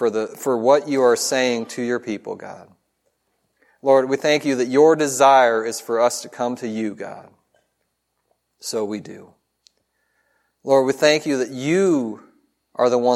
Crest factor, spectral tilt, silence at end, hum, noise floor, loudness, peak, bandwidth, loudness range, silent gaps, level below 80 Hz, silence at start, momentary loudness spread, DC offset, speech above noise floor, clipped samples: 20 dB; -4 dB/octave; 0 s; none; -73 dBFS; -19 LUFS; 0 dBFS; 15.5 kHz; 14 LU; none; -74 dBFS; 0 s; 18 LU; under 0.1%; 54 dB; under 0.1%